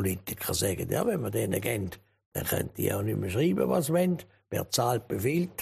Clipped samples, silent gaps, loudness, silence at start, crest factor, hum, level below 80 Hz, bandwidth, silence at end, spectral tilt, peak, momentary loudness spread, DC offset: under 0.1%; 2.26-2.32 s; -29 LUFS; 0 s; 16 dB; none; -56 dBFS; 15.5 kHz; 0 s; -5 dB/octave; -12 dBFS; 9 LU; under 0.1%